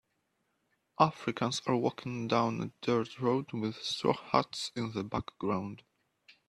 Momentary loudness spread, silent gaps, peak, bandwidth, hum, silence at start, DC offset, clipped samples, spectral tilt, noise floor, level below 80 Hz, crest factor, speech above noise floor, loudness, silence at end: 8 LU; none; -10 dBFS; 13 kHz; none; 1 s; under 0.1%; under 0.1%; -5.5 dB/octave; -79 dBFS; -66 dBFS; 24 dB; 47 dB; -33 LUFS; 0.15 s